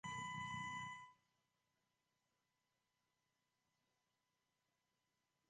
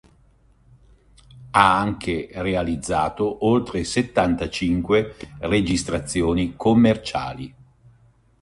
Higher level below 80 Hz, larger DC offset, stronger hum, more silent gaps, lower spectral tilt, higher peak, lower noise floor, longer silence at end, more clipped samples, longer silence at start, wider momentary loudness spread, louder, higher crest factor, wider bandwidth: second, -82 dBFS vs -42 dBFS; neither; neither; neither; second, -3 dB/octave vs -5.5 dB/octave; second, -38 dBFS vs 0 dBFS; first, -89 dBFS vs -56 dBFS; first, 4.35 s vs 0.9 s; neither; second, 0.05 s vs 1.35 s; about the same, 11 LU vs 11 LU; second, -49 LUFS vs -21 LUFS; about the same, 18 dB vs 22 dB; second, 9.4 kHz vs 11.5 kHz